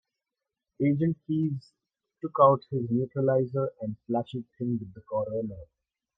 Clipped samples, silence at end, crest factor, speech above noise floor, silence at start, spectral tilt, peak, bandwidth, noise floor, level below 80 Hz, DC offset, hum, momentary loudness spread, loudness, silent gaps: under 0.1%; 0.55 s; 22 dB; 61 dB; 0.8 s; -11 dB/octave; -6 dBFS; 5.8 kHz; -88 dBFS; -66 dBFS; under 0.1%; none; 16 LU; -28 LUFS; none